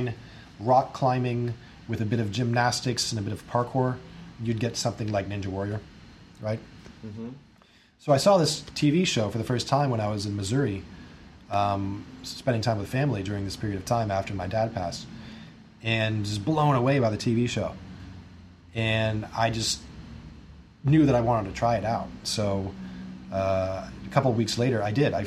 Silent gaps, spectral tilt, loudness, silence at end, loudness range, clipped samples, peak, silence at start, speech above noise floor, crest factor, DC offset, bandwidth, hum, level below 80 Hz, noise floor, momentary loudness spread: none; -5.5 dB/octave; -27 LUFS; 0 s; 5 LU; under 0.1%; -6 dBFS; 0 s; 32 dB; 22 dB; under 0.1%; 13.5 kHz; none; -52 dBFS; -58 dBFS; 18 LU